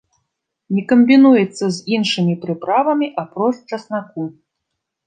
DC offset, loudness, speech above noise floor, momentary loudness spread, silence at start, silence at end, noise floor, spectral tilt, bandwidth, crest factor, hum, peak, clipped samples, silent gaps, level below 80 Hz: under 0.1%; -16 LUFS; 62 dB; 16 LU; 0.7 s; 0.75 s; -78 dBFS; -6 dB/octave; 9.4 kHz; 16 dB; none; -2 dBFS; under 0.1%; none; -66 dBFS